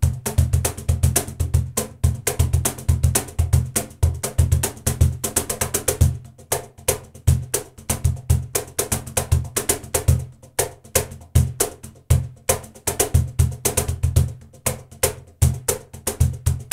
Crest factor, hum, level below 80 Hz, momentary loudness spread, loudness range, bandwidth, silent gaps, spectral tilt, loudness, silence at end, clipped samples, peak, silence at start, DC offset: 18 dB; none; -28 dBFS; 6 LU; 2 LU; 16.5 kHz; none; -4.5 dB/octave; -22 LUFS; 0.1 s; under 0.1%; -4 dBFS; 0 s; under 0.1%